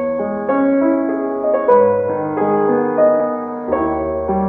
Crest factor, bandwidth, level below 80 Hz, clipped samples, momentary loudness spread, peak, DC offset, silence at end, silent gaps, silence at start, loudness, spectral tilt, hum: 14 dB; 3.5 kHz; -42 dBFS; under 0.1%; 7 LU; 0 dBFS; under 0.1%; 0 s; none; 0 s; -16 LUFS; -11.5 dB/octave; none